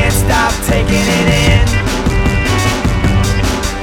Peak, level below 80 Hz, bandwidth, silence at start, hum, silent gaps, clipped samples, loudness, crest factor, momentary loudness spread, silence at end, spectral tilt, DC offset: 0 dBFS; -18 dBFS; 18 kHz; 0 s; none; none; under 0.1%; -13 LUFS; 12 dB; 4 LU; 0 s; -4.5 dB/octave; under 0.1%